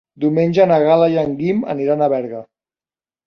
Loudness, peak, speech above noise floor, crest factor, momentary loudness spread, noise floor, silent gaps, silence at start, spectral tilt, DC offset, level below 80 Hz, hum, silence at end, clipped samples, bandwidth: -16 LUFS; -2 dBFS; over 75 dB; 14 dB; 9 LU; under -90 dBFS; none; 0.2 s; -8.5 dB/octave; under 0.1%; -58 dBFS; none; 0.85 s; under 0.1%; 6.6 kHz